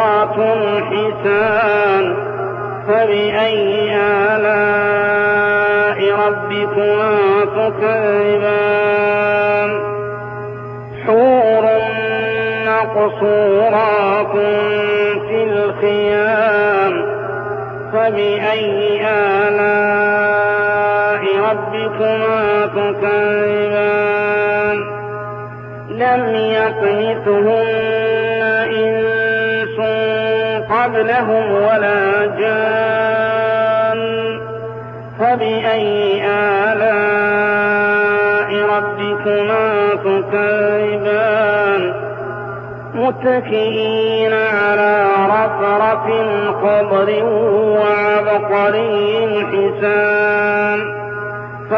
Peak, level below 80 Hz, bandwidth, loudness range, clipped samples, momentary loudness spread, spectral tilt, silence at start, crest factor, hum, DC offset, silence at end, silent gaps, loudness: -4 dBFS; -56 dBFS; 5.4 kHz; 3 LU; under 0.1%; 7 LU; -3 dB/octave; 0 s; 12 dB; none; under 0.1%; 0 s; none; -15 LUFS